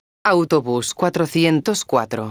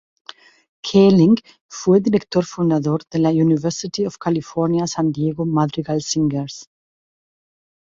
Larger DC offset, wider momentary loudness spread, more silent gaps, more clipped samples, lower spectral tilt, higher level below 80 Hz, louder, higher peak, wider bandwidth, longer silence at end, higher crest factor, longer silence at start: neither; second, 4 LU vs 10 LU; second, none vs 1.61-1.69 s; neither; second, -5 dB/octave vs -6.5 dB/octave; about the same, -58 dBFS vs -56 dBFS; about the same, -19 LUFS vs -18 LUFS; about the same, -2 dBFS vs -2 dBFS; first, over 20 kHz vs 7.8 kHz; second, 0 s vs 1.2 s; about the same, 16 dB vs 16 dB; second, 0.25 s vs 0.85 s